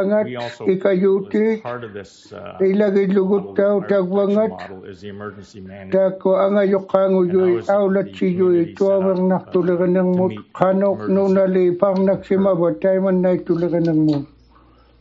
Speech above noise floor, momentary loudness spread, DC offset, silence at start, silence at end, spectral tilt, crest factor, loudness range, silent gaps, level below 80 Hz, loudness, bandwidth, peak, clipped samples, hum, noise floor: 33 dB; 17 LU; under 0.1%; 0 s; 0.75 s; -7.5 dB/octave; 18 dB; 3 LU; none; -60 dBFS; -18 LUFS; 7.4 kHz; 0 dBFS; under 0.1%; none; -50 dBFS